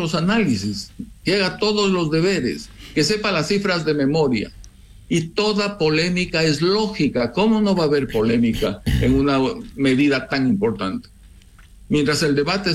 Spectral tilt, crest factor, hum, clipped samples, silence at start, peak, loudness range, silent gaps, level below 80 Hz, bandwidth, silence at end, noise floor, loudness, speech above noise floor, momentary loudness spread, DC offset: -5.5 dB/octave; 12 dB; none; under 0.1%; 0 s; -8 dBFS; 2 LU; none; -38 dBFS; 14.5 kHz; 0 s; -45 dBFS; -19 LUFS; 26 dB; 7 LU; under 0.1%